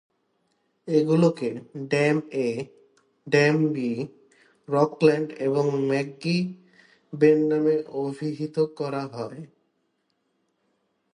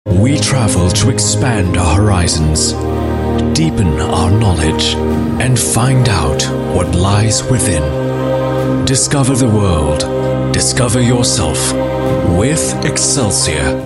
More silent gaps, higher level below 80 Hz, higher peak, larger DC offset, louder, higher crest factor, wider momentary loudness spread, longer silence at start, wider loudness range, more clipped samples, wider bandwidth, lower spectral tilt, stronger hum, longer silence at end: neither; second, -74 dBFS vs -26 dBFS; second, -6 dBFS vs 0 dBFS; neither; second, -24 LUFS vs -13 LUFS; first, 20 dB vs 12 dB; first, 14 LU vs 4 LU; first, 0.85 s vs 0.05 s; first, 4 LU vs 1 LU; neither; second, 10.5 kHz vs 13.5 kHz; first, -7 dB/octave vs -4.5 dB/octave; neither; first, 1.7 s vs 0 s